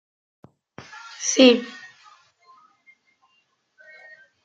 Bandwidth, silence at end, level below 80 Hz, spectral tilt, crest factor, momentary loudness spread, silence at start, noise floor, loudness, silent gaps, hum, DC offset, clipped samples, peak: 9 kHz; 2.75 s; -74 dBFS; -2 dB/octave; 24 dB; 27 LU; 1.2 s; -68 dBFS; -18 LUFS; none; none; under 0.1%; under 0.1%; -2 dBFS